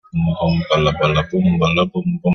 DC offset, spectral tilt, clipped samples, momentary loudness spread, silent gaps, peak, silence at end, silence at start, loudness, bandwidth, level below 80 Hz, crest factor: under 0.1%; -7 dB/octave; under 0.1%; 4 LU; none; 0 dBFS; 0 s; 0.15 s; -17 LUFS; 6.6 kHz; -38 dBFS; 16 dB